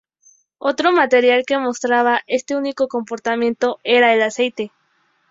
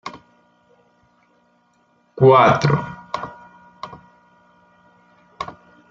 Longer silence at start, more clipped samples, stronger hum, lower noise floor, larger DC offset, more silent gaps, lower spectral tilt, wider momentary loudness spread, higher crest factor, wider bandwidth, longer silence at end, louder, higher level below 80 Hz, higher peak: first, 0.6 s vs 0.05 s; neither; neither; about the same, -63 dBFS vs -61 dBFS; neither; neither; second, -3 dB/octave vs -7 dB/octave; second, 9 LU vs 26 LU; about the same, 16 dB vs 20 dB; about the same, 7.8 kHz vs 7.4 kHz; first, 0.65 s vs 0.4 s; about the same, -17 LUFS vs -16 LUFS; second, -64 dBFS vs -54 dBFS; about the same, -2 dBFS vs -2 dBFS